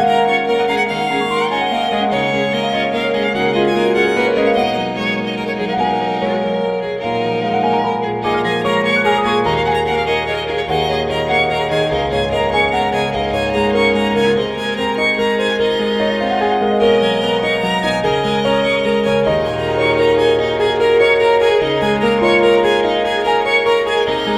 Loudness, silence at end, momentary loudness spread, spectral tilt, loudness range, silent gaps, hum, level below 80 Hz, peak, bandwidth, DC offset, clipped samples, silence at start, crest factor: -16 LUFS; 0 s; 5 LU; -5 dB/octave; 3 LU; none; none; -40 dBFS; -2 dBFS; 12.5 kHz; under 0.1%; under 0.1%; 0 s; 14 dB